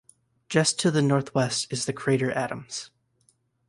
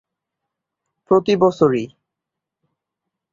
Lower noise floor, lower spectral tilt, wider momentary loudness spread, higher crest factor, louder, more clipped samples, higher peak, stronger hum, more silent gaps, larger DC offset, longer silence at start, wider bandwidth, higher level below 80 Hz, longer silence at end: second, -67 dBFS vs -84 dBFS; second, -4.5 dB/octave vs -7 dB/octave; first, 13 LU vs 10 LU; about the same, 18 dB vs 20 dB; second, -25 LUFS vs -17 LUFS; neither; second, -8 dBFS vs -2 dBFS; neither; neither; neither; second, 0.5 s vs 1.1 s; first, 11.5 kHz vs 7.4 kHz; about the same, -64 dBFS vs -60 dBFS; second, 0.85 s vs 1.45 s